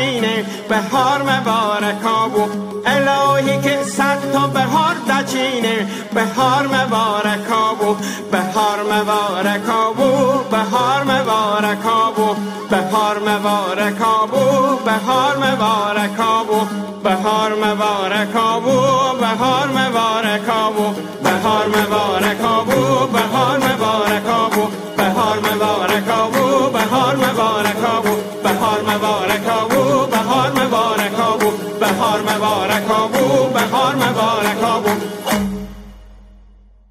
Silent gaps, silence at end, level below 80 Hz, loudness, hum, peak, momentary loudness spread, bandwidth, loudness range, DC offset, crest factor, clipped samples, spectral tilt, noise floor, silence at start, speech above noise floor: none; 0.65 s; -50 dBFS; -16 LUFS; none; -2 dBFS; 4 LU; 16 kHz; 1 LU; under 0.1%; 14 dB; under 0.1%; -4.5 dB/octave; -45 dBFS; 0 s; 29 dB